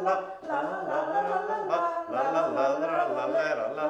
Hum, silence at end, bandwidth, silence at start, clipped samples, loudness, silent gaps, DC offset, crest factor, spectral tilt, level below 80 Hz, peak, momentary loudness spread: none; 0 s; 8.6 kHz; 0 s; under 0.1%; -28 LUFS; none; under 0.1%; 14 dB; -5.5 dB/octave; -72 dBFS; -14 dBFS; 4 LU